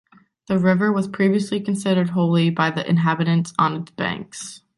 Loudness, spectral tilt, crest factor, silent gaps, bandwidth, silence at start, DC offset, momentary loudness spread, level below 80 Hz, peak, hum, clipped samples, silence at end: -20 LUFS; -6.5 dB/octave; 18 dB; none; 11.5 kHz; 0.5 s; under 0.1%; 8 LU; -60 dBFS; -4 dBFS; none; under 0.1%; 0.2 s